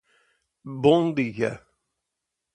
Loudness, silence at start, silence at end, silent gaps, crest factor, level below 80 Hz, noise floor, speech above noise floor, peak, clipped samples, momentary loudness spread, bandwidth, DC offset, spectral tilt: -23 LUFS; 0.65 s; 1 s; none; 20 dB; -62 dBFS; -83 dBFS; 61 dB; -6 dBFS; under 0.1%; 18 LU; 9.4 kHz; under 0.1%; -7 dB/octave